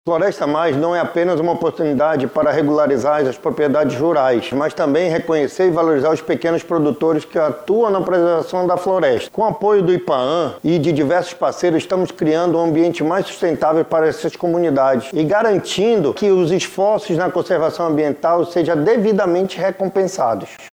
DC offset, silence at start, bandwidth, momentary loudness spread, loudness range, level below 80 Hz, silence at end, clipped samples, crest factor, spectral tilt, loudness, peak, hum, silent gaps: under 0.1%; 0.05 s; 16 kHz; 4 LU; 1 LU; -56 dBFS; 0.05 s; under 0.1%; 12 dB; -6 dB/octave; -17 LUFS; -4 dBFS; none; none